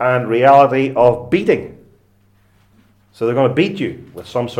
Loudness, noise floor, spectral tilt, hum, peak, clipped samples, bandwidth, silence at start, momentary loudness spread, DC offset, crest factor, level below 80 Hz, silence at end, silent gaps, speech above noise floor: -15 LUFS; -54 dBFS; -7.5 dB/octave; none; 0 dBFS; under 0.1%; 12.5 kHz; 0 s; 14 LU; under 0.1%; 16 dB; -52 dBFS; 0 s; none; 40 dB